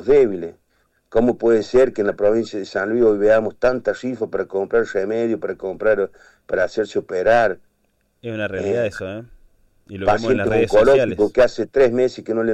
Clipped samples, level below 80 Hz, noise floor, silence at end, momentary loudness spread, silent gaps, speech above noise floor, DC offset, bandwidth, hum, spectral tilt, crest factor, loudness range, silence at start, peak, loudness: under 0.1%; -44 dBFS; -66 dBFS; 0 s; 11 LU; none; 47 dB; under 0.1%; 9.6 kHz; none; -6.5 dB/octave; 12 dB; 4 LU; 0 s; -6 dBFS; -19 LUFS